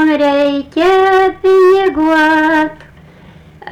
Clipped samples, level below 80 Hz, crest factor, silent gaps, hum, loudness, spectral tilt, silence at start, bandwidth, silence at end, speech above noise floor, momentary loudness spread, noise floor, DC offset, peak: under 0.1%; -44 dBFS; 6 dB; none; none; -11 LUFS; -5 dB/octave; 0 s; 10 kHz; 0 s; 29 dB; 6 LU; -39 dBFS; under 0.1%; -4 dBFS